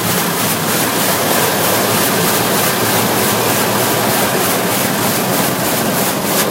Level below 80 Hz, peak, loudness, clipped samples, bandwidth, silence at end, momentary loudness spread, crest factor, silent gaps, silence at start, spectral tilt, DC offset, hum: -48 dBFS; 0 dBFS; -13 LUFS; under 0.1%; 16 kHz; 0 s; 2 LU; 14 dB; none; 0 s; -3 dB/octave; under 0.1%; none